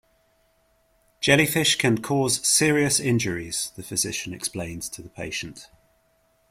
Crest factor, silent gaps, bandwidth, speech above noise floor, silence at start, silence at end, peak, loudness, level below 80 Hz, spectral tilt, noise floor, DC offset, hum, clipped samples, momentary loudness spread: 22 dB; none; 16.5 kHz; 41 dB; 1.2 s; 0.85 s; -4 dBFS; -22 LUFS; -56 dBFS; -3 dB/octave; -65 dBFS; under 0.1%; none; under 0.1%; 14 LU